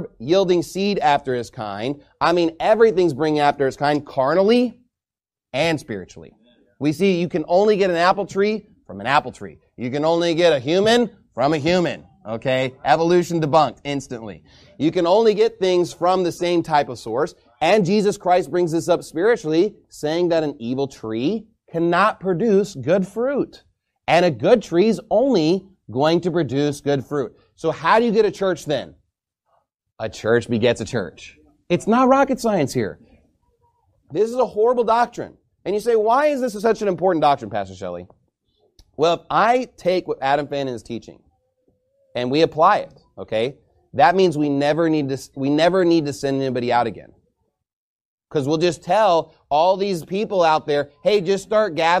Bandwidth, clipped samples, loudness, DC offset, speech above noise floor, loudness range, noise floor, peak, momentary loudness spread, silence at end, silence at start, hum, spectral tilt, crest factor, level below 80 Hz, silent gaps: 14.5 kHz; under 0.1%; -19 LUFS; under 0.1%; over 71 dB; 3 LU; under -90 dBFS; -2 dBFS; 11 LU; 0 s; 0 s; none; -5.5 dB/octave; 18 dB; -56 dBFS; 47.73-48.18 s